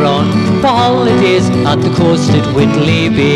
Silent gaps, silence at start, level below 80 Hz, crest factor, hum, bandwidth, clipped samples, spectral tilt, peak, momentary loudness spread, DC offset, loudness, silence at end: none; 0 s; -36 dBFS; 10 dB; none; 12 kHz; under 0.1%; -6.5 dB/octave; 0 dBFS; 2 LU; under 0.1%; -10 LUFS; 0 s